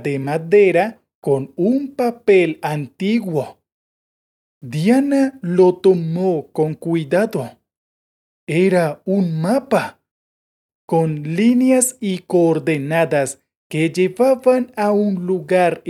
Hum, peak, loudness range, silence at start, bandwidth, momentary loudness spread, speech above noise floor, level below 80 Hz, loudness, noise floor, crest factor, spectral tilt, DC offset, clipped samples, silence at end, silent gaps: none; -4 dBFS; 3 LU; 0 s; 14 kHz; 10 LU; over 73 dB; -68 dBFS; -17 LUFS; under -90 dBFS; 14 dB; -6 dB/octave; under 0.1%; under 0.1%; 0 s; 1.15-1.22 s, 3.72-4.61 s, 7.77-8.47 s, 10.11-10.69 s, 10.75-10.88 s, 13.57-13.70 s